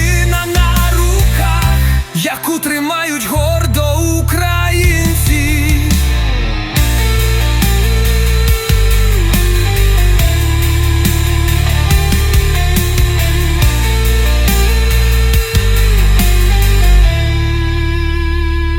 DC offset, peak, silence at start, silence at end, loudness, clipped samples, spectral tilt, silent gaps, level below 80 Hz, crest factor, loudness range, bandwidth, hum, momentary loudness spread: under 0.1%; 0 dBFS; 0 s; 0 s; -13 LUFS; under 0.1%; -4.5 dB/octave; none; -12 dBFS; 10 dB; 1 LU; 18 kHz; none; 3 LU